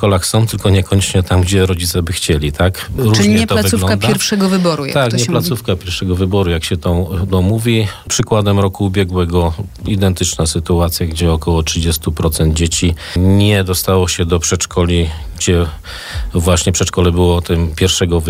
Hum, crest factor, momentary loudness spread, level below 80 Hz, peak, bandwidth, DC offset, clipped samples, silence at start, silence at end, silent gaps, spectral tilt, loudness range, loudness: none; 12 dB; 5 LU; -26 dBFS; -2 dBFS; 16 kHz; under 0.1%; under 0.1%; 0 s; 0 s; none; -5 dB/octave; 2 LU; -14 LUFS